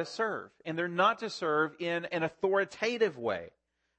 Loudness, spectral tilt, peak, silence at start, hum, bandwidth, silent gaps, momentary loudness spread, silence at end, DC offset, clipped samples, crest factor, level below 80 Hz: -31 LUFS; -5 dB/octave; -14 dBFS; 0 s; none; 8.8 kHz; none; 8 LU; 0.5 s; under 0.1%; under 0.1%; 18 dB; -76 dBFS